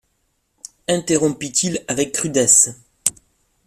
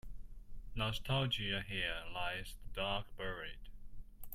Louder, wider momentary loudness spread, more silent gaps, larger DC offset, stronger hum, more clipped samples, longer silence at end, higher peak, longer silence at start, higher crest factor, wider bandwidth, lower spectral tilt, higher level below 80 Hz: first, -17 LUFS vs -40 LUFS; second, 11 LU vs 22 LU; neither; neither; neither; neither; first, 0.55 s vs 0 s; first, 0 dBFS vs -22 dBFS; first, 0.9 s vs 0.05 s; about the same, 20 dB vs 18 dB; about the same, 16 kHz vs 16 kHz; second, -3 dB/octave vs -5 dB/octave; second, -56 dBFS vs -50 dBFS